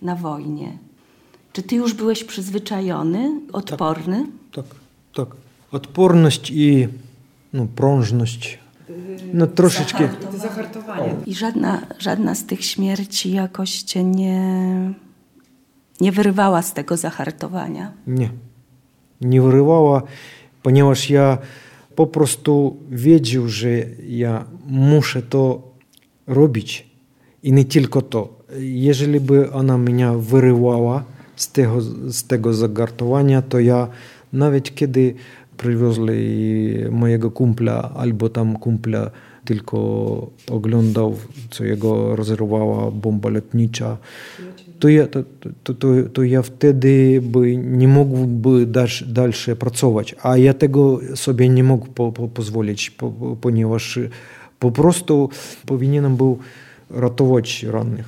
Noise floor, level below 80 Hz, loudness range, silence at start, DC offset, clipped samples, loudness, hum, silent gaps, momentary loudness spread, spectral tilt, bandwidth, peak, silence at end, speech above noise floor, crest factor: -56 dBFS; -58 dBFS; 6 LU; 0 s; under 0.1%; under 0.1%; -18 LUFS; none; none; 14 LU; -6.5 dB/octave; 16 kHz; -2 dBFS; 0 s; 39 dB; 16 dB